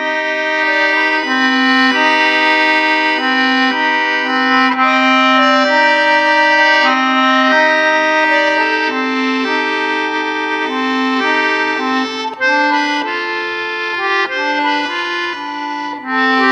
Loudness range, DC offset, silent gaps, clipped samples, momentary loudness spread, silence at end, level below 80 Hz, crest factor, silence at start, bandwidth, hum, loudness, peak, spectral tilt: 5 LU; under 0.1%; none; under 0.1%; 8 LU; 0 s; -68 dBFS; 14 dB; 0 s; 9.6 kHz; none; -13 LUFS; 0 dBFS; -2 dB/octave